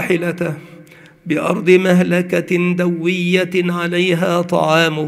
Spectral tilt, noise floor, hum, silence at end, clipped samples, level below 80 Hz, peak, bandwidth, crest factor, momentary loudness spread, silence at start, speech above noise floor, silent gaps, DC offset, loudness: -6 dB/octave; -42 dBFS; none; 0 s; under 0.1%; -62 dBFS; 0 dBFS; 14.5 kHz; 16 dB; 9 LU; 0 s; 26 dB; none; under 0.1%; -16 LUFS